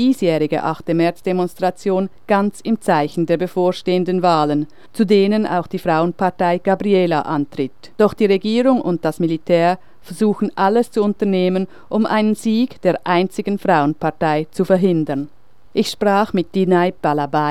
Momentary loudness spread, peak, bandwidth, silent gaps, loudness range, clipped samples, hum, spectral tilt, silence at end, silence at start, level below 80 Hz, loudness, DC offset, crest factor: 6 LU; -2 dBFS; 14 kHz; none; 1 LU; under 0.1%; none; -7 dB/octave; 0 s; 0 s; -56 dBFS; -18 LUFS; 1%; 16 dB